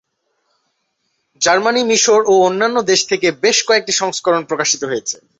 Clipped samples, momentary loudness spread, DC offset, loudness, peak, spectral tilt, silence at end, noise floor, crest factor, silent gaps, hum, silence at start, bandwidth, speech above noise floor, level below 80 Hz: under 0.1%; 6 LU; under 0.1%; -14 LUFS; -2 dBFS; -1.5 dB/octave; 0.25 s; -68 dBFS; 14 dB; none; none; 1.4 s; 8.2 kHz; 54 dB; -62 dBFS